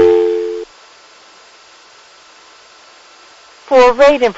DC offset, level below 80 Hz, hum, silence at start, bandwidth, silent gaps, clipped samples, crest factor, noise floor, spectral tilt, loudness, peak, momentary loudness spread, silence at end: under 0.1%; -46 dBFS; none; 0 s; 8 kHz; none; under 0.1%; 14 dB; -43 dBFS; -4 dB/octave; -11 LUFS; 0 dBFS; 18 LU; 0.05 s